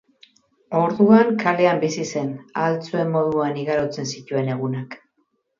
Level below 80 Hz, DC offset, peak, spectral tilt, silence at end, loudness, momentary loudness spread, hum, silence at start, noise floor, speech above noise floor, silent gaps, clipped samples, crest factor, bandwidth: -64 dBFS; under 0.1%; -2 dBFS; -6.5 dB/octave; 0.65 s; -21 LUFS; 13 LU; none; 0.7 s; -69 dBFS; 49 dB; none; under 0.1%; 18 dB; 7.4 kHz